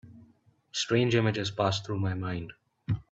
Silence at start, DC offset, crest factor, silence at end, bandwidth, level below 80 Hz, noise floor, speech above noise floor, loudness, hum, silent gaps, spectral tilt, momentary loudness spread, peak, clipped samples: 0.05 s; under 0.1%; 18 dB; 0.1 s; 8 kHz; -58 dBFS; -63 dBFS; 35 dB; -29 LUFS; none; none; -5.5 dB/octave; 13 LU; -12 dBFS; under 0.1%